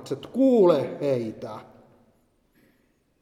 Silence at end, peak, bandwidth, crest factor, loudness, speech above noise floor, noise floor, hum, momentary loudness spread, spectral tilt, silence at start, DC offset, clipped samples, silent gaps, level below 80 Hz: 1.6 s; -8 dBFS; 12.5 kHz; 18 dB; -23 LUFS; 44 dB; -67 dBFS; none; 20 LU; -8 dB/octave; 0 s; under 0.1%; under 0.1%; none; -70 dBFS